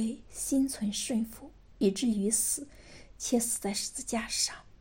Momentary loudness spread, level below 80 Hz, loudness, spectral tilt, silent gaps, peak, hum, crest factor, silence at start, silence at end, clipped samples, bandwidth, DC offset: 9 LU; -56 dBFS; -31 LUFS; -3 dB/octave; none; -14 dBFS; none; 18 dB; 0 s; 0.1 s; under 0.1%; 16.5 kHz; under 0.1%